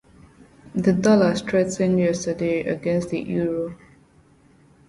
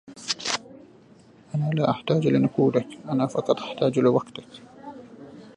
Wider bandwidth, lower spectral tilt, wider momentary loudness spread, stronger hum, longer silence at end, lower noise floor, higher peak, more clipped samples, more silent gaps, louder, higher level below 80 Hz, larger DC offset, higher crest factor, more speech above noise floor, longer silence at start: about the same, 11.5 kHz vs 11 kHz; about the same, -6.5 dB/octave vs -6 dB/octave; second, 9 LU vs 22 LU; neither; first, 1.15 s vs 0.1 s; about the same, -55 dBFS vs -52 dBFS; about the same, -6 dBFS vs -4 dBFS; neither; neither; about the same, -22 LUFS vs -24 LUFS; first, -54 dBFS vs -66 dBFS; neither; about the same, 18 dB vs 22 dB; first, 34 dB vs 29 dB; first, 0.65 s vs 0.1 s